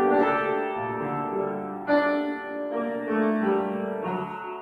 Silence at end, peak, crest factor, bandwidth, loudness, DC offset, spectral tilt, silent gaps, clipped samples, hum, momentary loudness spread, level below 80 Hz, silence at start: 0 s; -10 dBFS; 16 dB; 5.2 kHz; -27 LUFS; under 0.1%; -8 dB/octave; none; under 0.1%; none; 8 LU; -66 dBFS; 0 s